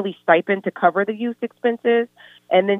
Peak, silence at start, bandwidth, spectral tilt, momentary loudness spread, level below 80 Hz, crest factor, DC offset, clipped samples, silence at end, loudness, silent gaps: -2 dBFS; 0 s; 3.9 kHz; -8 dB/octave; 8 LU; -82 dBFS; 18 dB; under 0.1%; under 0.1%; 0 s; -20 LUFS; none